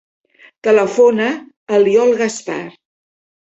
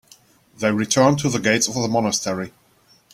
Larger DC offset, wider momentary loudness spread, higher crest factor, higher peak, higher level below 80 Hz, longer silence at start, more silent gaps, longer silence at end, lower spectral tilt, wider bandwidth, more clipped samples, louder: neither; first, 14 LU vs 10 LU; second, 14 dB vs 20 dB; about the same, -2 dBFS vs -2 dBFS; second, -62 dBFS vs -56 dBFS; about the same, 0.65 s vs 0.6 s; first, 1.57-1.67 s vs none; about the same, 0.75 s vs 0.65 s; about the same, -4.5 dB/octave vs -4 dB/octave; second, 8.2 kHz vs 16 kHz; neither; first, -15 LUFS vs -20 LUFS